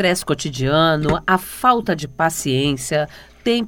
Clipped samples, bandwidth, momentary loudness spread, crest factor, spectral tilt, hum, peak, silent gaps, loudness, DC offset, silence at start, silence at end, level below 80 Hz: under 0.1%; 19.5 kHz; 7 LU; 18 dB; -4.5 dB/octave; none; 0 dBFS; none; -19 LUFS; under 0.1%; 0 s; 0 s; -42 dBFS